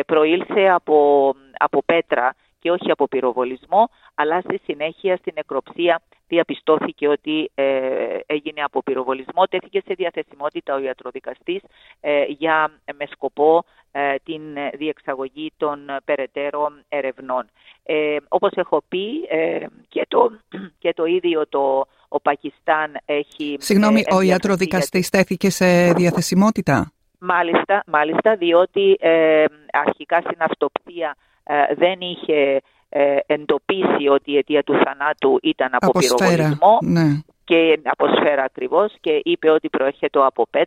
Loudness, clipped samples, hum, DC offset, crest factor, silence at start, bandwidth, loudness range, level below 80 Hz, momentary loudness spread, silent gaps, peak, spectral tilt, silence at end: -19 LUFS; under 0.1%; none; under 0.1%; 18 dB; 0 s; 16 kHz; 7 LU; -60 dBFS; 12 LU; none; -2 dBFS; -5.5 dB/octave; 0 s